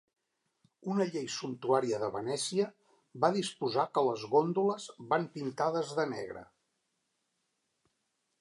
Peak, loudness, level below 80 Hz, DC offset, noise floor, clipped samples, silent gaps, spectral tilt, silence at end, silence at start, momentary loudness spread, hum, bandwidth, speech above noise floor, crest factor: -12 dBFS; -32 LUFS; -78 dBFS; under 0.1%; -81 dBFS; under 0.1%; none; -5 dB/octave; 1.95 s; 0.85 s; 9 LU; none; 11.5 kHz; 49 dB; 22 dB